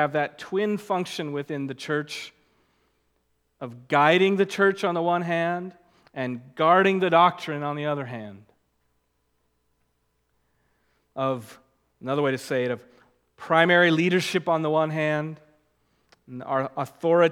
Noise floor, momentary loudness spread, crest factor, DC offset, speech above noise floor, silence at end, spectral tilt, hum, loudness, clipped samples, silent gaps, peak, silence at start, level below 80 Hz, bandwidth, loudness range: -72 dBFS; 20 LU; 22 dB; under 0.1%; 48 dB; 0 s; -5.5 dB/octave; none; -24 LUFS; under 0.1%; none; -4 dBFS; 0 s; -76 dBFS; 16 kHz; 12 LU